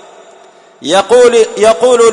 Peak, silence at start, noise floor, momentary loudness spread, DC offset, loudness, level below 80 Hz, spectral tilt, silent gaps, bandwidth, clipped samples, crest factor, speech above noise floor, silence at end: 0 dBFS; 0.8 s; -40 dBFS; 6 LU; under 0.1%; -8 LUFS; -50 dBFS; -2.5 dB/octave; none; 11 kHz; 0.3%; 10 dB; 32 dB; 0 s